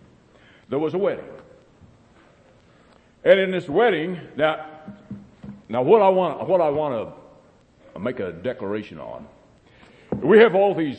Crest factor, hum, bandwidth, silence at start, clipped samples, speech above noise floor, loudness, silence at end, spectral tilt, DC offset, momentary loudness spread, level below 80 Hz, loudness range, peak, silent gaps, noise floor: 20 dB; none; 8.4 kHz; 0.7 s; under 0.1%; 34 dB; -21 LUFS; 0 s; -7.5 dB/octave; under 0.1%; 24 LU; -60 dBFS; 10 LU; -2 dBFS; none; -54 dBFS